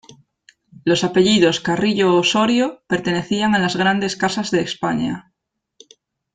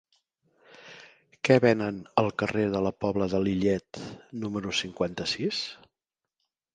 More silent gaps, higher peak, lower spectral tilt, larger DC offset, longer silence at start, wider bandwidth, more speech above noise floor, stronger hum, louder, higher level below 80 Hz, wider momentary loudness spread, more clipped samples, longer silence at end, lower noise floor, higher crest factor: neither; first, -2 dBFS vs -6 dBFS; about the same, -4.5 dB/octave vs -5.5 dB/octave; neither; about the same, 0.85 s vs 0.8 s; about the same, 9.4 kHz vs 9.8 kHz; about the same, 59 dB vs 62 dB; neither; first, -18 LUFS vs -27 LUFS; about the same, -56 dBFS vs -58 dBFS; second, 7 LU vs 18 LU; neither; first, 1.15 s vs 1 s; second, -77 dBFS vs -89 dBFS; second, 16 dB vs 22 dB